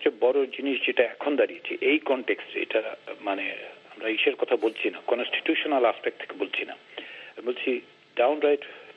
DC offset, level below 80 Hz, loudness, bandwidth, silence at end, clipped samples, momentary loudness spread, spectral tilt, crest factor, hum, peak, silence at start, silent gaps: under 0.1%; -78 dBFS; -27 LUFS; 5.6 kHz; 0.05 s; under 0.1%; 12 LU; -5 dB/octave; 20 dB; none; -6 dBFS; 0 s; none